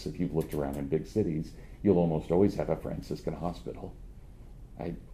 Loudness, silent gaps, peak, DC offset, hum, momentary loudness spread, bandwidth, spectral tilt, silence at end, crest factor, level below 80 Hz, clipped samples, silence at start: -31 LUFS; none; -10 dBFS; under 0.1%; none; 18 LU; 15.5 kHz; -8.5 dB/octave; 0 s; 22 dB; -46 dBFS; under 0.1%; 0 s